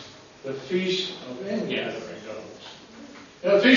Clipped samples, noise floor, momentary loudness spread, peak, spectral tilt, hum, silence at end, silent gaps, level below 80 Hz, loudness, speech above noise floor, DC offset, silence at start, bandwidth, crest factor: under 0.1%; -45 dBFS; 20 LU; -6 dBFS; -5 dB/octave; none; 0 s; none; -68 dBFS; -28 LUFS; 21 dB; under 0.1%; 0 s; 7.4 kHz; 20 dB